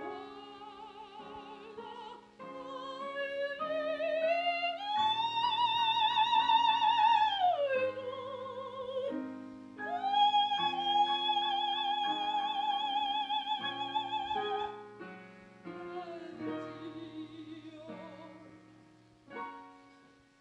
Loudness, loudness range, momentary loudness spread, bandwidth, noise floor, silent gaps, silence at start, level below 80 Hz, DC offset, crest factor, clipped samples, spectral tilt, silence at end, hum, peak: -32 LUFS; 17 LU; 21 LU; 8.2 kHz; -62 dBFS; none; 0 s; -76 dBFS; under 0.1%; 18 dB; under 0.1%; -3.5 dB/octave; 0.5 s; none; -16 dBFS